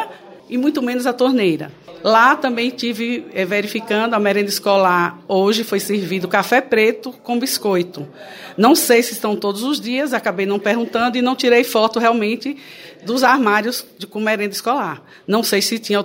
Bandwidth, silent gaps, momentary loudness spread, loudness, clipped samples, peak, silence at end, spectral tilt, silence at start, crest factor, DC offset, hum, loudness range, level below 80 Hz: 16.5 kHz; none; 12 LU; -17 LUFS; under 0.1%; 0 dBFS; 0 s; -4 dB/octave; 0 s; 16 dB; under 0.1%; none; 2 LU; -68 dBFS